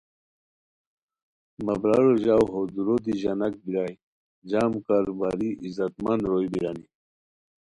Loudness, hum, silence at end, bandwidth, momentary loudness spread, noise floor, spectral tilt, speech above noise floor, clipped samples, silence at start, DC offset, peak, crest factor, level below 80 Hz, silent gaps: -25 LUFS; none; 0.9 s; 11 kHz; 10 LU; under -90 dBFS; -8 dB/octave; over 66 dB; under 0.1%; 1.6 s; under 0.1%; -8 dBFS; 18 dB; -58 dBFS; 4.03-4.42 s